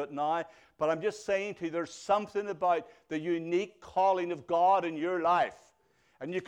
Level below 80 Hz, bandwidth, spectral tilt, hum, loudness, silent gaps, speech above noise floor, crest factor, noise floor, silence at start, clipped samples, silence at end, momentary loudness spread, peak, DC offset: -72 dBFS; 10.5 kHz; -5.5 dB/octave; none; -31 LUFS; none; 39 dB; 16 dB; -69 dBFS; 0 s; under 0.1%; 0 s; 9 LU; -16 dBFS; under 0.1%